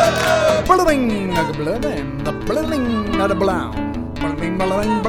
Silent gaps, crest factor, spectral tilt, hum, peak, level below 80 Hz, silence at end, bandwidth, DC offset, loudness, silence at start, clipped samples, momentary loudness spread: none; 18 dB; -5.5 dB/octave; none; 0 dBFS; -34 dBFS; 0 s; 19 kHz; under 0.1%; -19 LUFS; 0 s; under 0.1%; 10 LU